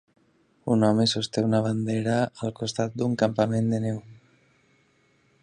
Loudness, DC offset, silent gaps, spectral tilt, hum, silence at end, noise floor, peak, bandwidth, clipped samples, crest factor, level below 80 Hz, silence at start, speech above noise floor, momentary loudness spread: -25 LUFS; under 0.1%; none; -6 dB/octave; none; 1.3 s; -64 dBFS; -8 dBFS; 10.5 kHz; under 0.1%; 18 dB; -62 dBFS; 0.65 s; 40 dB; 8 LU